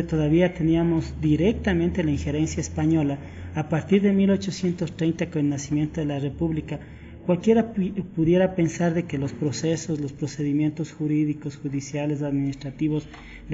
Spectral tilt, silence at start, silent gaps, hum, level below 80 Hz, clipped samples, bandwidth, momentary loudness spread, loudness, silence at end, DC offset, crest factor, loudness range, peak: -7.5 dB/octave; 0 s; none; none; -44 dBFS; under 0.1%; 8 kHz; 10 LU; -24 LUFS; 0 s; under 0.1%; 16 dB; 3 LU; -8 dBFS